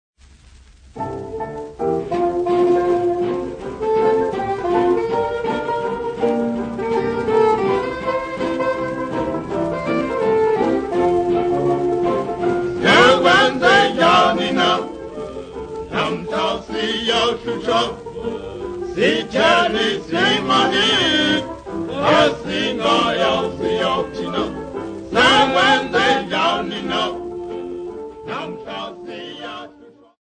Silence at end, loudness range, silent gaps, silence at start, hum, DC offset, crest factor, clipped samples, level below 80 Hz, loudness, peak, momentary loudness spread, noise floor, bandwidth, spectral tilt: 0.35 s; 7 LU; none; 0.95 s; none; under 0.1%; 18 dB; under 0.1%; -46 dBFS; -18 LUFS; 0 dBFS; 16 LU; -46 dBFS; 9.6 kHz; -4.5 dB/octave